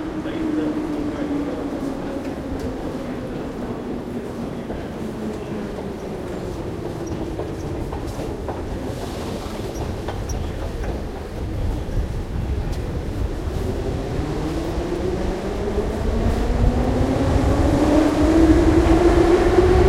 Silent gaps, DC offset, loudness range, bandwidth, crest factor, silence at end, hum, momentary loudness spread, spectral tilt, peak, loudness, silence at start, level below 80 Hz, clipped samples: none; under 0.1%; 11 LU; 15 kHz; 18 dB; 0 s; none; 13 LU; -7 dB/octave; -2 dBFS; -23 LUFS; 0 s; -28 dBFS; under 0.1%